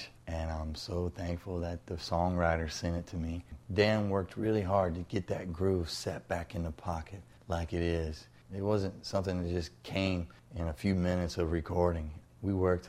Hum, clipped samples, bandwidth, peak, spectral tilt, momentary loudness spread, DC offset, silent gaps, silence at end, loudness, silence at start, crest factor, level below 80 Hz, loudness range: none; under 0.1%; 13.5 kHz; -12 dBFS; -6.5 dB/octave; 10 LU; under 0.1%; none; 0 s; -34 LUFS; 0 s; 20 dB; -48 dBFS; 4 LU